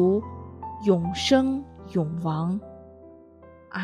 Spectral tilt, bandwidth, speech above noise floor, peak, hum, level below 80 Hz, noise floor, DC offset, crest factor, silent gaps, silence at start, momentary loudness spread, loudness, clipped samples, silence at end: -6 dB/octave; 11 kHz; 26 dB; -6 dBFS; none; -56 dBFS; -50 dBFS; under 0.1%; 20 dB; none; 0 s; 18 LU; -25 LUFS; under 0.1%; 0 s